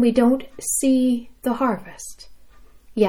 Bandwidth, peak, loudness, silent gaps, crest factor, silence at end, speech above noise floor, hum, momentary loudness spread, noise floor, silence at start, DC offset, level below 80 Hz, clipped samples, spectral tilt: 17 kHz; -6 dBFS; -21 LUFS; none; 16 dB; 0 s; 25 dB; none; 18 LU; -46 dBFS; 0 s; under 0.1%; -52 dBFS; under 0.1%; -4.5 dB/octave